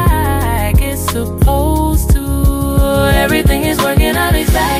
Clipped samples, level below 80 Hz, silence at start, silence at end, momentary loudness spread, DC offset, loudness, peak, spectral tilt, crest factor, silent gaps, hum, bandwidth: under 0.1%; -16 dBFS; 0 s; 0 s; 3 LU; under 0.1%; -13 LUFS; -2 dBFS; -5.5 dB/octave; 10 dB; none; none; 16 kHz